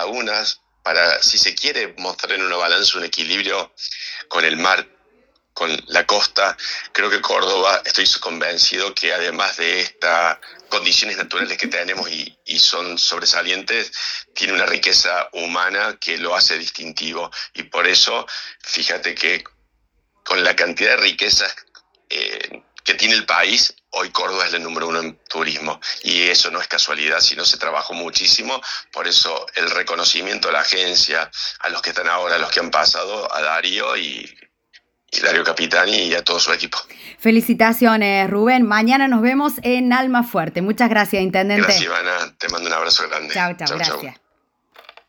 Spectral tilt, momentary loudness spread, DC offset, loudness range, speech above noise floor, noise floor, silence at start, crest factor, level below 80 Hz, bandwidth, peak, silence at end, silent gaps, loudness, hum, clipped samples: -1.5 dB/octave; 10 LU; under 0.1%; 3 LU; 48 dB; -67 dBFS; 0 s; 18 dB; -58 dBFS; over 20 kHz; 0 dBFS; 0.95 s; none; -17 LUFS; none; under 0.1%